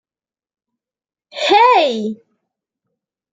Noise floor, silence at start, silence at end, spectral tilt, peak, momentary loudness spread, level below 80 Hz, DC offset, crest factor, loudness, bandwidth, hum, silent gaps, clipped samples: under -90 dBFS; 1.35 s; 1.2 s; -3.5 dB/octave; -2 dBFS; 23 LU; -70 dBFS; under 0.1%; 18 dB; -13 LUFS; 9.2 kHz; none; none; under 0.1%